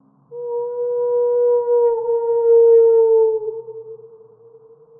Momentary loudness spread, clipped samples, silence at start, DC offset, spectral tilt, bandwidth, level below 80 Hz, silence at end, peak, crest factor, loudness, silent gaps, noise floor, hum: 19 LU; under 0.1%; 0.3 s; under 0.1%; -11 dB/octave; 1.9 kHz; -74 dBFS; 0.95 s; -6 dBFS; 12 dB; -16 LUFS; none; -47 dBFS; none